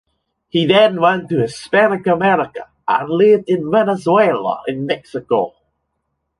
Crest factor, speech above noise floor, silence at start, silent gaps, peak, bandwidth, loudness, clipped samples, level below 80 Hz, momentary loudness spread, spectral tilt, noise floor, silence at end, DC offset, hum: 14 dB; 57 dB; 0.55 s; none; -2 dBFS; 11.5 kHz; -16 LUFS; under 0.1%; -58 dBFS; 10 LU; -6.5 dB/octave; -72 dBFS; 0.9 s; under 0.1%; none